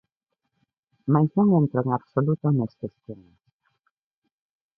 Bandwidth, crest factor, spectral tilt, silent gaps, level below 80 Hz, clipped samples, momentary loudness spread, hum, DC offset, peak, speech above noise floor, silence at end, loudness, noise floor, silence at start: 2 kHz; 20 dB; -13.5 dB/octave; none; -62 dBFS; under 0.1%; 18 LU; none; under 0.1%; -6 dBFS; 58 dB; 1.65 s; -23 LUFS; -81 dBFS; 1.05 s